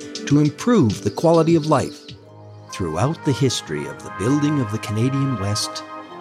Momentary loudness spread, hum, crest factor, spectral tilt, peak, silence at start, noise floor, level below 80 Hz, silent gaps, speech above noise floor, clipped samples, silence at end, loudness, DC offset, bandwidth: 14 LU; none; 16 dB; -6 dB/octave; -4 dBFS; 0 s; -41 dBFS; -54 dBFS; none; 22 dB; under 0.1%; 0 s; -20 LUFS; under 0.1%; 14.5 kHz